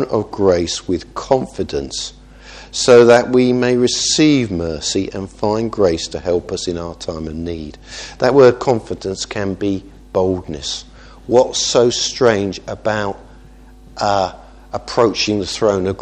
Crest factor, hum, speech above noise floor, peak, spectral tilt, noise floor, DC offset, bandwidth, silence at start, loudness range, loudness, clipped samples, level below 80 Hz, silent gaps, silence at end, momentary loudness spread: 16 dB; none; 25 dB; 0 dBFS; -4.5 dB/octave; -41 dBFS; under 0.1%; 10 kHz; 0 s; 6 LU; -16 LUFS; under 0.1%; -40 dBFS; none; 0 s; 15 LU